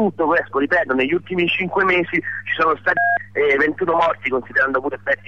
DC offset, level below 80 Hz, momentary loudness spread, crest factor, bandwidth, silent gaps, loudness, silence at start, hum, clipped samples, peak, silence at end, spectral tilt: 0.4%; -58 dBFS; 5 LU; 12 dB; 7.6 kHz; none; -18 LUFS; 0 s; 50 Hz at -45 dBFS; under 0.1%; -6 dBFS; 0.15 s; -6.5 dB/octave